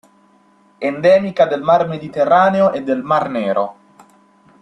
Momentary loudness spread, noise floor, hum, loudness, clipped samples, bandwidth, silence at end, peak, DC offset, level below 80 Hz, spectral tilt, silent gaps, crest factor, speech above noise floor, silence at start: 9 LU; -53 dBFS; none; -16 LUFS; under 0.1%; 9.6 kHz; 0.9 s; 0 dBFS; under 0.1%; -60 dBFS; -7 dB/octave; none; 16 dB; 38 dB; 0.8 s